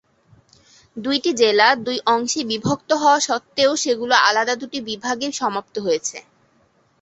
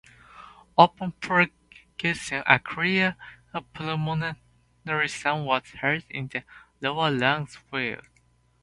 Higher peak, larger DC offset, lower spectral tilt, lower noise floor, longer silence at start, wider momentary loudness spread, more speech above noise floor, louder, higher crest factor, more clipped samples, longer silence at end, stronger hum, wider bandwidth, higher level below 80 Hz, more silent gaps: about the same, 0 dBFS vs 0 dBFS; neither; second, -2.5 dB/octave vs -5 dB/octave; second, -60 dBFS vs -64 dBFS; first, 0.95 s vs 0.35 s; second, 11 LU vs 16 LU; about the same, 41 dB vs 38 dB; first, -19 LUFS vs -25 LUFS; second, 20 dB vs 26 dB; neither; first, 0.8 s vs 0.65 s; neither; second, 8.4 kHz vs 11.5 kHz; about the same, -62 dBFS vs -60 dBFS; neither